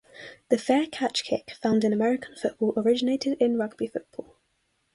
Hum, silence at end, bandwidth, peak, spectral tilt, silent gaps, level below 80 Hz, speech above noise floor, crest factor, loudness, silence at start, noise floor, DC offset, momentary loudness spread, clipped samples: none; 0.7 s; 11.5 kHz; -8 dBFS; -5 dB/octave; none; -68 dBFS; 47 dB; 18 dB; -26 LUFS; 0.15 s; -73 dBFS; under 0.1%; 13 LU; under 0.1%